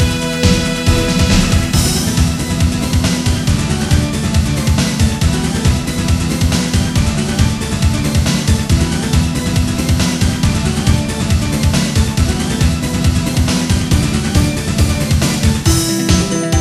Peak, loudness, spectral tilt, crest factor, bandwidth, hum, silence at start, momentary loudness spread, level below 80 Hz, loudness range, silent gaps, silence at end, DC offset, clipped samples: 0 dBFS; -14 LUFS; -5 dB/octave; 14 dB; 15.5 kHz; none; 0 s; 3 LU; -20 dBFS; 1 LU; none; 0 s; under 0.1%; under 0.1%